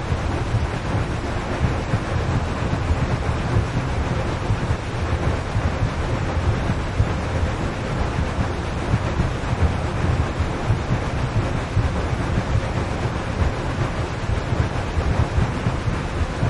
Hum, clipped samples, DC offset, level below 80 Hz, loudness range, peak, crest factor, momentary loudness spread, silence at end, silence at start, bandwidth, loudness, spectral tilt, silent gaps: none; under 0.1%; under 0.1%; -28 dBFS; 1 LU; -6 dBFS; 16 dB; 3 LU; 0 s; 0 s; 11 kHz; -23 LUFS; -6.5 dB/octave; none